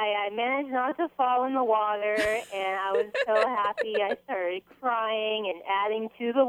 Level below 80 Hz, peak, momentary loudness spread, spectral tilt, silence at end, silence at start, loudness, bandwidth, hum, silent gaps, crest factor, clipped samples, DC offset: -66 dBFS; -10 dBFS; 6 LU; -3.5 dB/octave; 0 s; 0 s; -27 LUFS; 16 kHz; 60 Hz at -70 dBFS; none; 16 dB; under 0.1%; under 0.1%